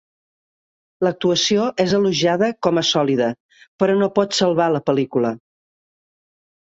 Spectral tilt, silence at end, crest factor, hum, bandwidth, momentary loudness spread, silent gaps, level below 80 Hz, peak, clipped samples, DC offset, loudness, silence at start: -4.5 dB/octave; 1.3 s; 18 dB; none; 8 kHz; 6 LU; 3.40-3.49 s, 3.68-3.79 s; -60 dBFS; -2 dBFS; under 0.1%; under 0.1%; -18 LUFS; 1 s